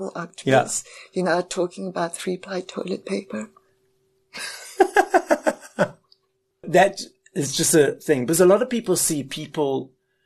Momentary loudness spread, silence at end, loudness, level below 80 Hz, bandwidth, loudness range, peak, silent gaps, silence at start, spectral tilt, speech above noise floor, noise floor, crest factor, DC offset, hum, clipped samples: 15 LU; 0.4 s; -22 LUFS; -62 dBFS; 13 kHz; 8 LU; -2 dBFS; none; 0 s; -4 dB/octave; 48 dB; -70 dBFS; 20 dB; under 0.1%; none; under 0.1%